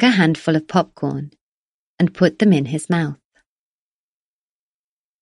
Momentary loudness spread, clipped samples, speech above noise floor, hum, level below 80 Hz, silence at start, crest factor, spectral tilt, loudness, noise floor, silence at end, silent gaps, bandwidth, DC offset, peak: 13 LU; under 0.1%; over 73 dB; none; -60 dBFS; 0 s; 20 dB; -6.5 dB/octave; -18 LUFS; under -90 dBFS; 2.1 s; 1.41-1.98 s; 11.5 kHz; under 0.1%; 0 dBFS